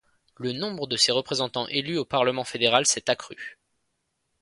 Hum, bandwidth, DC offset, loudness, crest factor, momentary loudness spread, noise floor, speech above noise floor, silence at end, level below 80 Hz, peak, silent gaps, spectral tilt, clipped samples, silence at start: none; 11.5 kHz; under 0.1%; -24 LUFS; 22 dB; 13 LU; -76 dBFS; 51 dB; 0.9 s; -66 dBFS; -4 dBFS; none; -2.5 dB/octave; under 0.1%; 0.4 s